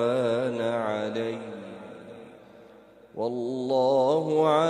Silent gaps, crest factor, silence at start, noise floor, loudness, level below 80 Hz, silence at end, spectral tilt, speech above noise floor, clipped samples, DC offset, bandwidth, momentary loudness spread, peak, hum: none; 16 dB; 0 s; -52 dBFS; -26 LUFS; -74 dBFS; 0 s; -6.5 dB/octave; 27 dB; under 0.1%; under 0.1%; 11 kHz; 21 LU; -10 dBFS; none